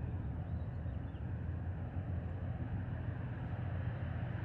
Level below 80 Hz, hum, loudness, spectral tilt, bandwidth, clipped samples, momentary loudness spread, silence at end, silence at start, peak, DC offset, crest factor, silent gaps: -50 dBFS; none; -42 LUFS; -10.5 dB/octave; 4.1 kHz; under 0.1%; 2 LU; 0 s; 0 s; -28 dBFS; under 0.1%; 12 dB; none